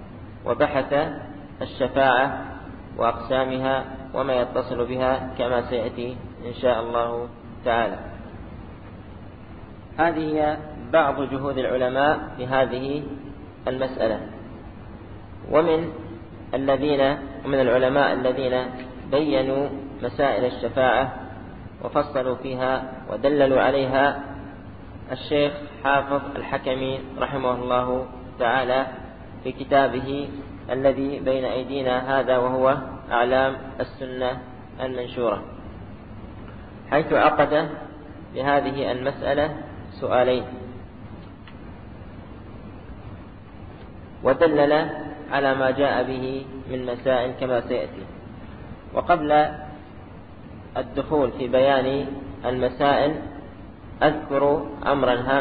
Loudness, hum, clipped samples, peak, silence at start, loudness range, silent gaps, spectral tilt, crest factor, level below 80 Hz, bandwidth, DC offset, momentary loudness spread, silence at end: -23 LUFS; none; under 0.1%; -4 dBFS; 0 s; 5 LU; none; -10.5 dB/octave; 20 dB; -46 dBFS; 4.9 kHz; 0.3%; 21 LU; 0 s